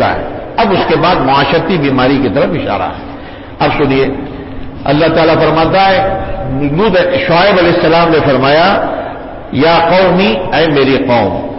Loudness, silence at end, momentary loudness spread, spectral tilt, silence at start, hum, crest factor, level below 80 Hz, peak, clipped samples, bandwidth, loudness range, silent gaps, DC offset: -10 LUFS; 0 s; 12 LU; -10 dB/octave; 0 s; none; 10 dB; -30 dBFS; -2 dBFS; under 0.1%; 5.8 kHz; 4 LU; none; under 0.1%